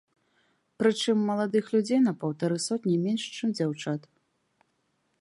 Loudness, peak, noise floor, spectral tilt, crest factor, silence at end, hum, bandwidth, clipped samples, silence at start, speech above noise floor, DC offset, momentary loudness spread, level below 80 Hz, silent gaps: -27 LUFS; -12 dBFS; -74 dBFS; -5.5 dB/octave; 18 dB; 1.2 s; none; 11.5 kHz; under 0.1%; 0.8 s; 48 dB; under 0.1%; 6 LU; -78 dBFS; none